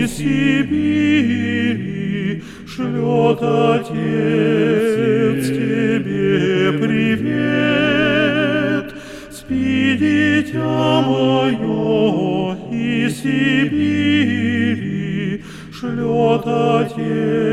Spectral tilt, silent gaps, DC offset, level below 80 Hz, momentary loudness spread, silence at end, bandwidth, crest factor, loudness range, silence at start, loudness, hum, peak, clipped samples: -6.5 dB/octave; none; under 0.1%; -46 dBFS; 8 LU; 0 s; 13.5 kHz; 16 dB; 2 LU; 0 s; -17 LUFS; none; -2 dBFS; under 0.1%